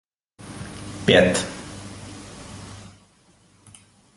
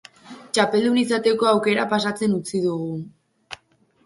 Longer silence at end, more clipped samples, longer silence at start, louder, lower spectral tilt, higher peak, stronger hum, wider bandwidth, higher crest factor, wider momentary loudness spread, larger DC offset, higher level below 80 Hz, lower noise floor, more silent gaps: first, 1.35 s vs 0.5 s; neither; first, 0.45 s vs 0.25 s; about the same, -19 LUFS vs -21 LUFS; about the same, -4 dB/octave vs -5 dB/octave; about the same, -2 dBFS vs -4 dBFS; neither; about the same, 11.5 kHz vs 11.5 kHz; first, 24 dB vs 18 dB; first, 25 LU vs 21 LU; neither; first, -48 dBFS vs -64 dBFS; about the same, -57 dBFS vs -60 dBFS; neither